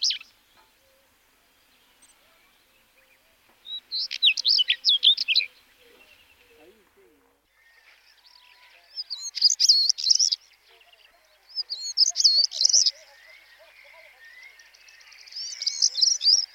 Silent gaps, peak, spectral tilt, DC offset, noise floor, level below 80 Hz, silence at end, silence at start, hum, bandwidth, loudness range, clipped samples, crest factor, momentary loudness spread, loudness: none; -6 dBFS; 6 dB/octave; under 0.1%; -63 dBFS; -78 dBFS; 0.1 s; 0 s; 50 Hz at -80 dBFS; 17 kHz; 10 LU; under 0.1%; 22 dB; 18 LU; -20 LUFS